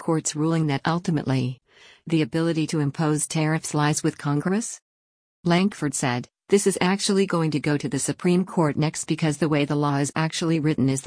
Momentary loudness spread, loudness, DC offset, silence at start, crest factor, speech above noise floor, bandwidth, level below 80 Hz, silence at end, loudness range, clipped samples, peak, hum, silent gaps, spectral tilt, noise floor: 5 LU; -23 LUFS; under 0.1%; 0 s; 16 dB; over 67 dB; 10.5 kHz; -60 dBFS; 0 s; 2 LU; under 0.1%; -6 dBFS; none; 4.82-5.43 s; -5 dB/octave; under -90 dBFS